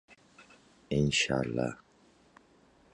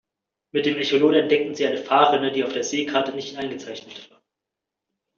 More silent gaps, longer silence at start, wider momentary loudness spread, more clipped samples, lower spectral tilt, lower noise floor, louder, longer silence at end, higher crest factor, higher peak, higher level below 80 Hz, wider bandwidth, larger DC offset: neither; second, 0.1 s vs 0.55 s; second, 10 LU vs 17 LU; neither; first, -4.5 dB/octave vs -2 dB/octave; second, -63 dBFS vs -85 dBFS; second, -30 LUFS vs -21 LUFS; about the same, 1.2 s vs 1.1 s; about the same, 18 dB vs 20 dB; second, -16 dBFS vs -4 dBFS; first, -56 dBFS vs -70 dBFS; first, 11 kHz vs 7.4 kHz; neither